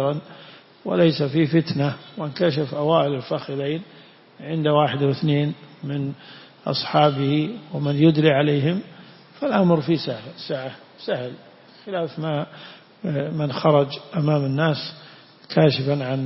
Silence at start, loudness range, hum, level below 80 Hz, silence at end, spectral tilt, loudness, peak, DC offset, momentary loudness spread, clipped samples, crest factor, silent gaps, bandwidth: 0 s; 5 LU; none; -64 dBFS; 0 s; -10.5 dB/octave; -22 LUFS; -4 dBFS; under 0.1%; 16 LU; under 0.1%; 18 dB; none; 5.8 kHz